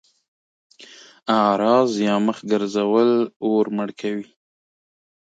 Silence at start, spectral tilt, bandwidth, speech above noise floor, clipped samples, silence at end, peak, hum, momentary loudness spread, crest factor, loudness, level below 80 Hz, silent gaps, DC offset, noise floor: 0.8 s; -6 dB/octave; 9 kHz; 27 dB; under 0.1%; 1.1 s; -4 dBFS; none; 10 LU; 18 dB; -20 LUFS; -70 dBFS; 3.36-3.40 s; under 0.1%; -46 dBFS